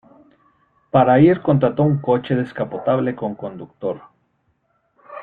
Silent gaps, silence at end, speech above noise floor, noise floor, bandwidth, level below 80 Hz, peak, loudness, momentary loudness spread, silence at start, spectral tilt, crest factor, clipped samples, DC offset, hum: none; 0 s; 48 dB; -66 dBFS; 4.5 kHz; -56 dBFS; -2 dBFS; -18 LUFS; 17 LU; 0.95 s; -11 dB/octave; 18 dB; under 0.1%; under 0.1%; none